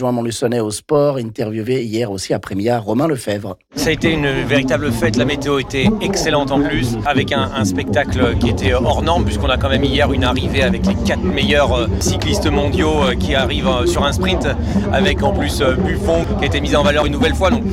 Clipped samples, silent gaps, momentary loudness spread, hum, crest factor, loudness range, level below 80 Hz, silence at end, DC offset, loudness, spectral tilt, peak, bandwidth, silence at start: under 0.1%; none; 4 LU; none; 12 dB; 3 LU; -26 dBFS; 0 s; under 0.1%; -16 LUFS; -5.5 dB/octave; -4 dBFS; 16 kHz; 0 s